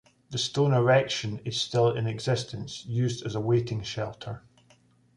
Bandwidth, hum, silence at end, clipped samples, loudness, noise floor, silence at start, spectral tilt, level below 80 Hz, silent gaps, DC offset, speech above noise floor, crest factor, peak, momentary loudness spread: 11 kHz; none; 0.8 s; under 0.1%; -27 LUFS; -62 dBFS; 0.3 s; -5.5 dB/octave; -60 dBFS; none; under 0.1%; 35 dB; 18 dB; -10 dBFS; 13 LU